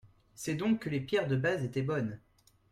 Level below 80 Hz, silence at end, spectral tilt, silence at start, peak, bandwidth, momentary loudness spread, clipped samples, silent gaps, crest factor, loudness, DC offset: -66 dBFS; 0.55 s; -6.5 dB/octave; 0.05 s; -18 dBFS; 15 kHz; 9 LU; under 0.1%; none; 16 dB; -33 LUFS; under 0.1%